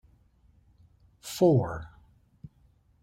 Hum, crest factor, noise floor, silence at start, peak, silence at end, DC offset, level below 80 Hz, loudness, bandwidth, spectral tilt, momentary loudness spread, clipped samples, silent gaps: none; 20 dB; -64 dBFS; 1.25 s; -10 dBFS; 0.55 s; under 0.1%; -56 dBFS; -27 LUFS; 16 kHz; -7 dB/octave; 23 LU; under 0.1%; none